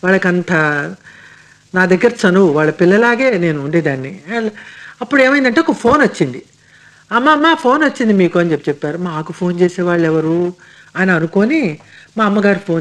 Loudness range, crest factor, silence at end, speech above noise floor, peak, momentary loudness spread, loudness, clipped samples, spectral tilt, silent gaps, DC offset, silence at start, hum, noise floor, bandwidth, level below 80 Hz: 3 LU; 14 dB; 0 s; 32 dB; 0 dBFS; 11 LU; -14 LUFS; under 0.1%; -6.5 dB/octave; none; under 0.1%; 0.05 s; none; -45 dBFS; 10.5 kHz; -54 dBFS